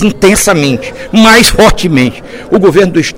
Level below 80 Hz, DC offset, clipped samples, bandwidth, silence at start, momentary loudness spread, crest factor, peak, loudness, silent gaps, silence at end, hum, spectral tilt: -22 dBFS; under 0.1%; 4%; 18.5 kHz; 0 s; 10 LU; 8 dB; 0 dBFS; -7 LUFS; none; 0 s; none; -4 dB/octave